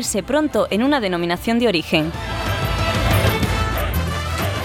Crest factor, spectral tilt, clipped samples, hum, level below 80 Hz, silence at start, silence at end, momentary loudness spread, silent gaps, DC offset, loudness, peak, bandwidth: 16 dB; -5 dB/octave; under 0.1%; none; -30 dBFS; 0 s; 0 s; 5 LU; none; under 0.1%; -19 LUFS; -4 dBFS; 18 kHz